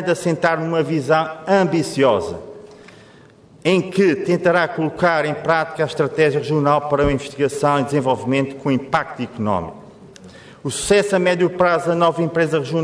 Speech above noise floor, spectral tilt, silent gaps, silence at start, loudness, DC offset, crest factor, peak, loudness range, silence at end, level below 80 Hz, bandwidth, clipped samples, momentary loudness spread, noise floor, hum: 29 dB; -5.5 dB/octave; none; 0 s; -18 LUFS; under 0.1%; 16 dB; -4 dBFS; 3 LU; 0 s; -46 dBFS; 11 kHz; under 0.1%; 6 LU; -46 dBFS; none